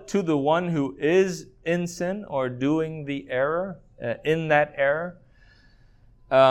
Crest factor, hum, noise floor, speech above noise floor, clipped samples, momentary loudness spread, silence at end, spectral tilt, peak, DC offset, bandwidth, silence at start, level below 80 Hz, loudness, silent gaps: 18 dB; none; -55 dBFS; 30 dB; under 0.1%; 11 LU; 0 s; -6 dB/octave; -6 dBFS; under 0.1%; 15.5 kHz; 0 s; -56 dBFS; -25 LUFS; none